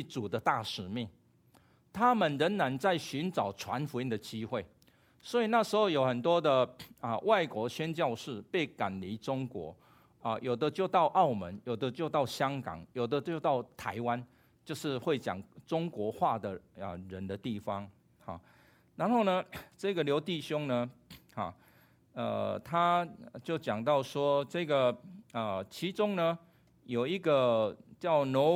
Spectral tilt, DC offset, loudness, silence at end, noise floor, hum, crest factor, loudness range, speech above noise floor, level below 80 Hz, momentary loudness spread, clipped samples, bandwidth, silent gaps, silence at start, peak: -6 dB/octave; under 0.1%; -33 LUFS; 0 s; -65 dBFS; none; 20 dB; 5 LU; 33 dB; -72 dBFS; 14 LU; under 0.1%; 16.5 kHz; none; 0 s; -12 dBFS